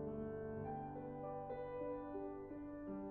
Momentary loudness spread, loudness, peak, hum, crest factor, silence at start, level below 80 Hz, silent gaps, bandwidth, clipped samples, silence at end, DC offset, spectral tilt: 3 LU; -48 LUFS; -36 dBFS; none; 12 dB; 0 s; -66 dBFS; none; 4.2 kHz; under 0.1%; 0 s; under 0.1%; -9 dB/octave